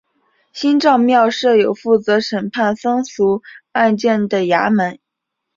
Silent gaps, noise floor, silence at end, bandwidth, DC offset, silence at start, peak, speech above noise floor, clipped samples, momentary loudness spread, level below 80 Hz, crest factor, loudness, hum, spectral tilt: none; -78 dBFS; 0.6 s; 7.6 kHz; under 0.1%; 0.55 s; -2 dBFS; 63 dB; under 0.1%; 8 LU; -60 dBFS; 14 dB; -16 LUFS; none; -5.5 dB/octave